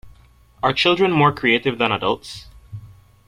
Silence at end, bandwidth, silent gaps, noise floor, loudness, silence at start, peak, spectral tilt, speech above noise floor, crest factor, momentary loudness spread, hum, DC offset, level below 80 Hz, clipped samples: 0.35 s; 14 kHz; none; -50 dBFS; -18 LUFS; 0.05 s; -4 dBFS; -5.5 dB/octave; 32 dB; 18 dB; 23 LU; none; under 0.1%; -50 dBFS; under 0.1%